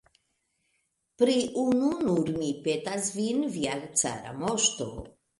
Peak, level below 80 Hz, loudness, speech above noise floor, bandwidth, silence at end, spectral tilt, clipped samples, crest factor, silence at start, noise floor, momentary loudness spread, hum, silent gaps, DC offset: -10 dBFS; -58 dBFS; -28 LUFS; 48 dB; 11.5 kHz; 0.3 s; -3.5 dB/octave; under 0.1%; 20 dB; 1.2 s; -76 dBFS; 6 LU; none; none; under 0.1%